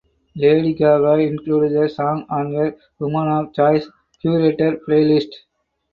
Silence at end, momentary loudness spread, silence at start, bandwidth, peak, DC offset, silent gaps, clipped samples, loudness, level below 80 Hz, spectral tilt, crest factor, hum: 0.55 s; 9 LU; 0.35 s; 5.4 kHz; -2 dBFS; under 0.1%; none; under 0.1%; -18 LUFS; -56 dBFS; -9.5 dB/octave; 16 dB; none